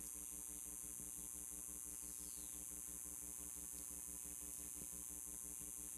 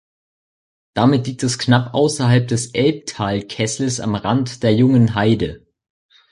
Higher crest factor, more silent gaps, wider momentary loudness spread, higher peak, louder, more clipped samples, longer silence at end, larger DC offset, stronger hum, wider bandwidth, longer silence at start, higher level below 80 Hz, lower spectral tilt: about the same, 20 dB vs 16 dB; neither; second, 0 LU vs 8 LU; second, -30 dBFS vs -2 dBFS; second, -48 LUFS vs -18 LUFS; neither; second, 0 s vs 0.75 s; neither; neither; first, 15.5 kHz vs 11.5 kHz; second, 0 s vs 0.95 s; second, -66 dBFS vs -48 dBFS; second, -1.5 dB/octave vs -5.5 dB/octave